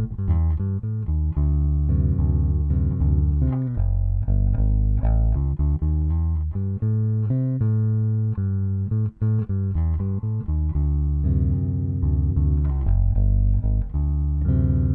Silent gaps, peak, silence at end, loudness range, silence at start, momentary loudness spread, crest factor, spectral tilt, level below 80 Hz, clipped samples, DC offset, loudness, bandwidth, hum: none; -10 dBFS; 0 s; 1 LU; 0 s; 4 LU; 10 dB; -14 dB/octave; -24 dBFS; under 0.1%; under 0.1%; -23 LUFS; 2.1 kHz; none